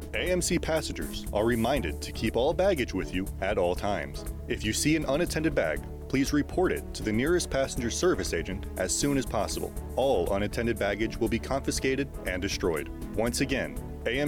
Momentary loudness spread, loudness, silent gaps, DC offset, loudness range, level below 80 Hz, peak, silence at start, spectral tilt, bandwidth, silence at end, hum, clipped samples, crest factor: 7 LU; -29 LUFS; none; under 0.1%; 1 LU; -40 dBFS; -14 dBFS; 0 s; -4.5 dB/octave; 18 kHz; 0 s; none; under 0.1%; 14 dB